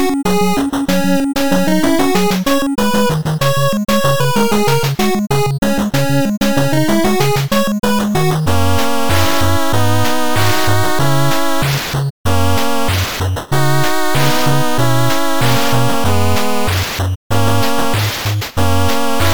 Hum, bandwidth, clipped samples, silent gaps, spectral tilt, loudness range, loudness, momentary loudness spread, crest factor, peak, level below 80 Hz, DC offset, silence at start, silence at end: none; over 20 kHz; under 0.1%; 5.58-5.62 s, 6.37-6.41 s, 12.10-12.25 s, 17.16-17.30 s; -5 dB/octave; 2 LU; -15 LUFS; 3 LU; 12 dB; -2 dBFS; -34 dBFS; 10%; 0 s; 0 s